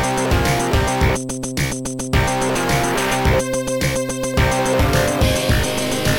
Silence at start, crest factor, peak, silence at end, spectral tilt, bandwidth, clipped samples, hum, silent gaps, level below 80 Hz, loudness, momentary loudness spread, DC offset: 0 s; 14 dB; -4 dBFS; 0 s; -4.5 dB/octave; 17 kHz; under 0.1%; none; none; -26 dBFS; -18 LUFS; 5 LU; under 0.1%